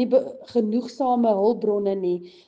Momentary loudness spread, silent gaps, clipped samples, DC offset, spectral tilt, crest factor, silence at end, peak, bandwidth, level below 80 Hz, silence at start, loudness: 6 LU; none; under 0.1%; under 0.1%; -8 dB/octave; 14 dB; 0.2 s; -8 dBFS; 7.8 kHz; -70 dBFS; 0 s; -23 LUFS